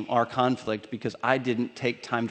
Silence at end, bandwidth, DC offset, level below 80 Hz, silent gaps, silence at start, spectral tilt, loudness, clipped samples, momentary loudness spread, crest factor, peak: 0 s; 9 kHz; under 0.1%; -68 dBFS; none; 0 s; -6 dB/octave; -28 LUFS; under 0.1%; 7 LU; 22 dB; -6 dBFS